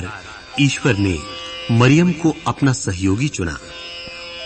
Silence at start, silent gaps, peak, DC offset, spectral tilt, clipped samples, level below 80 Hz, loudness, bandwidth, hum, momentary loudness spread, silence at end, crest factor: 0 s; none; -2 dBFS; under 0.1%; -5.5 dB/octave; under 0.1%; -42 dBFS; -18 LUFS; 8.8 kHz; none; 17 LU; 0 s; 18 dB